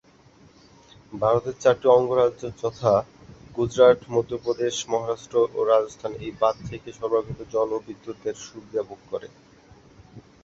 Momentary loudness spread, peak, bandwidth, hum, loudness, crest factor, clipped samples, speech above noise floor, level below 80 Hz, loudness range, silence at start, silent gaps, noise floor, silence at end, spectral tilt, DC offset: 17 LU; -4 dBFS; 7.8 kHz; none; -24 LUFS; 20 dB; under 0.1%; 31 dB; -56 dBFS; 9 LU; 1.1 s; none; -54 dBFS; 0.25 s; -5.5 dB/octave; under 0.1%